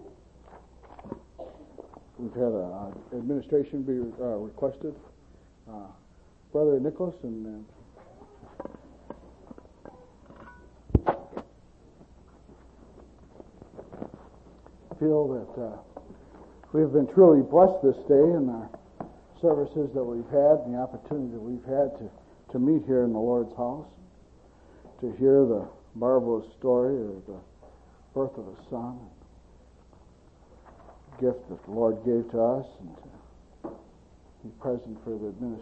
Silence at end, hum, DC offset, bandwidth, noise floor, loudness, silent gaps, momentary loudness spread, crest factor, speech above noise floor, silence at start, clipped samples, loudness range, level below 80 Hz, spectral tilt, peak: 0 s; none; under 0.1%; 5 kHz; -56 dBFS; -26 LUFS; none; 25 LU; 22 dB; 31 dB; 0 s; under 0.1%; 15 LU; -50 dBFS; -10.5 dB/octave; -6 dBFS